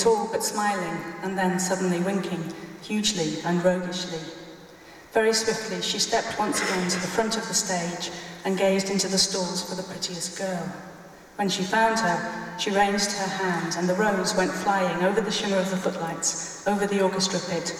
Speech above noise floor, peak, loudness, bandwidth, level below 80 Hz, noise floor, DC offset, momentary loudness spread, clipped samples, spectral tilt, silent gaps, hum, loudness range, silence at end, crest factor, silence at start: 22 dB; -8 dBFS; -25 LUFS; 16 kHz; -60 dBFS; -47 dBFS; under 0.1%; 10 LU; under 0.1%; -3.5 dB/octave; none; none; 3 LU; 0 s; 18 dB; 0 s